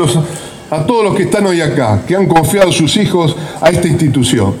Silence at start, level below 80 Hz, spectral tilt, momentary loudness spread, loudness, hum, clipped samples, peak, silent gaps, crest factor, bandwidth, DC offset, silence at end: 0 s; -38 dBFS; -5.5 dB/octave; 6 LU; -11 LUFS; none; under 0.1%; 0 dBFS; none; 12 dB; 15.5 kHz; under 0.1%; 0 s